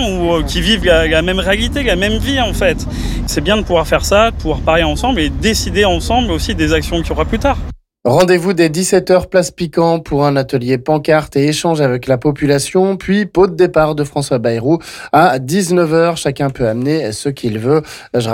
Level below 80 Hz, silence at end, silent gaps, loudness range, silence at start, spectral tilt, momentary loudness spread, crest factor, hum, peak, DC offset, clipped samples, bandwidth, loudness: -26 dBFS; 0 s; none; 1 LU; 0 s; -5 dB/octave; 6 LU; 12 dB; none; -2 dBFS; under 0.1%; under 0.1%; 17 kHz; -14 LUFS